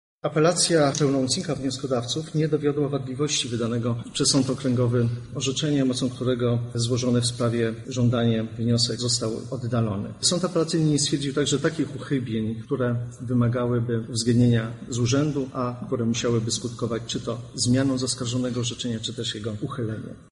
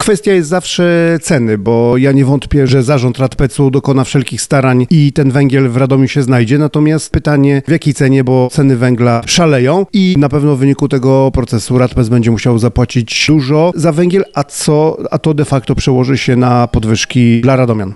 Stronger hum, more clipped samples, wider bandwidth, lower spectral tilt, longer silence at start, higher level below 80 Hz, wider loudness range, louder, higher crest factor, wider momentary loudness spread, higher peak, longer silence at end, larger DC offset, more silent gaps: neither; neither; about the same, 11.5 kHz vs 12 kHz; about the same, -5 dB/octave vs -6 dB/octave; first, 0.25 s vs 0 s; second, -54 dBFS vs -30 dBFS; about the same, 2 LU vs 1 LU; second, -24 LUFS vs -10 LUFS; first, 16 dB vs 10 dB; first, 7 LU vs 4 LU; second, -8 dBFS vs 0 dBFS; about the same, 0.1 s vs 0 s; second, under 0.1% vs 0.3%; neither